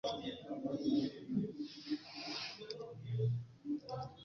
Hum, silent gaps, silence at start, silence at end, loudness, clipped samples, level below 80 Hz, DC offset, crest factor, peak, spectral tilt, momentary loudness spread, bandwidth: none; none; 0.05 s; 0 s; -41 LUFS; under 0.1%; -72 dBFS; under 0.1%; 16 dB; -24 dBFS; -6 dB/octave; 10 LU; 7 kHz